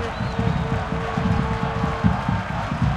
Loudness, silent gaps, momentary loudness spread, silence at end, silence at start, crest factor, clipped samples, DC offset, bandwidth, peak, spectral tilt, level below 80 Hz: -23 LUFS; none; 4 LU; 0 s; 0 s; 18 dB; under 0.1%; under 0.1%; 10.5 kHz; -4 dBFS; -7.5 dB/octave; -32 dBFS